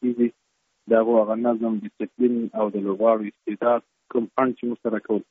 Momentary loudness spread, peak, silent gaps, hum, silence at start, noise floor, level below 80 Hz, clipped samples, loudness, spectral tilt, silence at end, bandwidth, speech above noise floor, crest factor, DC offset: 8 LU; -6 dBFS; none; none; 0 s; -72 dBFS; -72 dBFS; under 0.1%; -23 LUFS; -7 dB/octave; 0.1 s; 3.8 kHz; 49 dB; 18 dB; under 0.1%